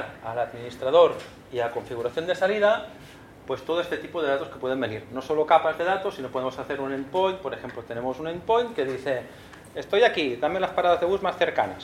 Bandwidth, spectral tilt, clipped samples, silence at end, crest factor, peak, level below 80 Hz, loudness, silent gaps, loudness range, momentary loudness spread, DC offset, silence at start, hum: 14 kHz; -5 dB/octave; under 0.1%; 0 s; 22 dB; -4 dBFS; -58 dBFS; -25 LUFS; none; 3 LU; 14 LU; under 0.1%; 0 s; none